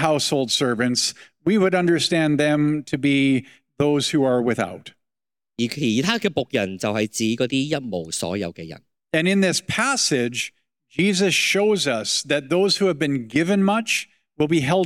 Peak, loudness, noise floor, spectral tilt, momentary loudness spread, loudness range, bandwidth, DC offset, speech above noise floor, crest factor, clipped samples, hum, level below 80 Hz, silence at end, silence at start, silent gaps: -4 dBFS; -21 LUFS; under -90 dBFS; -4 dB/octave; 9 LU; 4 LU; 17 kHz; under 0.1%; over 69 dB; 18 dB; under 0.1%; none; -62 dBFS; 0 s; 0 s; none